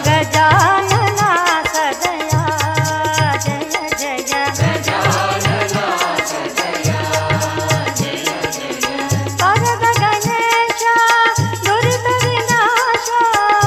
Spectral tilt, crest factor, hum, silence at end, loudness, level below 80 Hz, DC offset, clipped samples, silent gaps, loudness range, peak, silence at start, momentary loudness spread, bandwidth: -3.5 dB/octave; 14 dB; none; 0 s; -15 LUFS; -44 dBFS; under 0.1%; under 0.1%; none; 4 LU; 0 dBFS; 0 s; 7 LU; 17 kHz